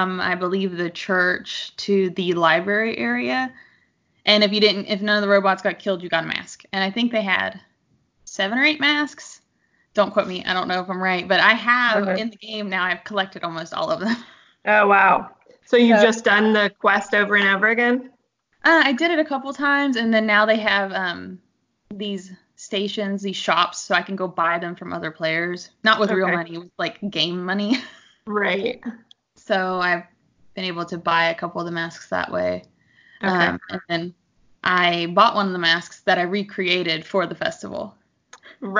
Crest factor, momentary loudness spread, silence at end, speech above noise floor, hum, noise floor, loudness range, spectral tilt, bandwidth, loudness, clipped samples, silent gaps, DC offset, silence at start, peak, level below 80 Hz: 22 dB; 13 LU; 0 s; 45 dB; none; -65 dBFS; 7 LU; -4.5 dB/octave; 7.6 kHz; -20 LUFS; under 0.1%; none; under 0.1%; 0 s; 0 dBFS; -64 dBFS